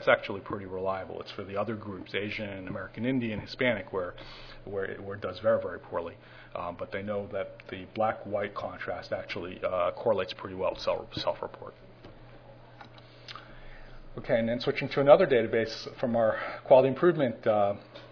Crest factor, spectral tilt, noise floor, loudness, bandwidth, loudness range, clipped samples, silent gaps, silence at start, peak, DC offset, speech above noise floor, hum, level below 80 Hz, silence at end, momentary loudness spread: 26 dB; -4 dB/octave; -51 dBFS; -30 LUFS; 5.4 kHz; 11 LU; under 0.1%; none; 0 s; -4 dBFS; under 0.1%; 21 dB; none; -56 dBFS; 0 s; 20 LU